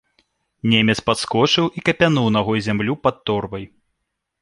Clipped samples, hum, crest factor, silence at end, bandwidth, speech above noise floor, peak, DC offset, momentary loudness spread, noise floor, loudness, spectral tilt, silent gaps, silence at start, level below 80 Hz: under 0.1%; none; 18 dB; 0.75 s; 11.5 kHz; 58 dB; -2 dBFS; under 0.1%; 8 LU; -77 dBFS; -18 LUFS; -5 dB/octave; none; 0.65 s; -50 dBFS